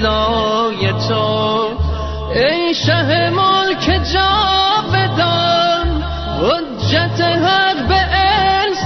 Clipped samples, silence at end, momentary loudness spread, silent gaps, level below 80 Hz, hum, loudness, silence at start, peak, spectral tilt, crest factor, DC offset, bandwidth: under 0.1%; 0 s; 5 LU; none; -26 dBFS; none; -14 LUFS; 0 s; -2 dBFS; -3 dB/octave; 12 dB; under 0.1%; 6.4 kHz